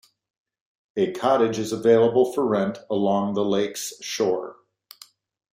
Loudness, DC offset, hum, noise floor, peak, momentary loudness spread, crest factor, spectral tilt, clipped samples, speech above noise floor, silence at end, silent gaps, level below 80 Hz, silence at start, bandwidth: -22 LUFS; under 0.1%; none; -52 dBFS; -6 dBFS; 12 LU; 18 dB; -5 dB/octave; under 0.1%; 31 dB; 1 s; none; -66 dBFS; 0.95 s; 16 kHz